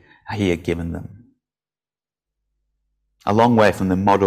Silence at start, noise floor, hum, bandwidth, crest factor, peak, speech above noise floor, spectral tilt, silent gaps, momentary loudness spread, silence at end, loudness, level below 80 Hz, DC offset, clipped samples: 0.25 s; under -90 dBFS; 50 Hz at -60 dBFS; 15 kHz; 18 dB; -4 dBFS; over 73 dB; -7 dB/octave; none; 15 LU; 0 s; -19 LUFS; -42 dBFS; under 0.1%; under 0.1%